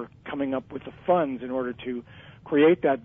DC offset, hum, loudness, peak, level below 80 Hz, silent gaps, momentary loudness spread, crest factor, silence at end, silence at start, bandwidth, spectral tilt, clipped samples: under 0.1%; none; -26 LUFS; -10 dBFS; -60 dBFS; none; 15 LU; 16 dB; 0.05 s; 0 s; 3.7 kHz; -5 dB/octave; under 0.1%